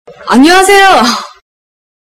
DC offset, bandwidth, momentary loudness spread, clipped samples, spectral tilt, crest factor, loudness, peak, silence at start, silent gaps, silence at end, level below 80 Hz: under 0.1%; 17 kHz; 8 LU; 2%; -2 dB/octave; 8 dB; -5 LUFS; 0 dBFS; 0.05 s; none; 0.85 s; -40 dBFS